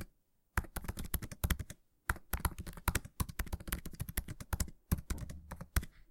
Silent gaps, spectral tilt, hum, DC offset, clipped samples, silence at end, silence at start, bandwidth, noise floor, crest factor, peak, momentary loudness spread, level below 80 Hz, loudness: none; -4 dB/octave; none; under 0.1%; under 0.1%; 0.1 s; 0 s; 17 kHz; -70 dBFS; 26 dB; -14 dBFS; 7 LU; -44 dBFS; -41 LUFS